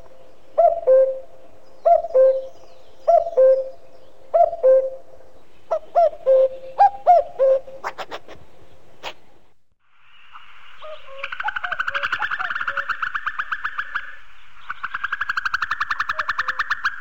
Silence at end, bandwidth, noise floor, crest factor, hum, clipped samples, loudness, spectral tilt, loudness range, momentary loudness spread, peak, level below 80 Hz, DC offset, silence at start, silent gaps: 0 s; 7.4 kHz; -55 dBFS; 16 dB; none; under 0.1%; -20 LUFS; -2.5 dB/octave; 12 LU; 19 LU; -4 dBFS; -58 dBFS; 2%; 0.55 s; none